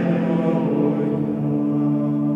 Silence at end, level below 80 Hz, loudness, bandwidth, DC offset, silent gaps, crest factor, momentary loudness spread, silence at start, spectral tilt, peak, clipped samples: 0 s; -58 dBFS; -21 LUFS; 5.2 kHz; under 0.1%; none; 12 dB; 2 LU; 0 s; -10.5 dB/octave; -8 dBFS; under 0.1%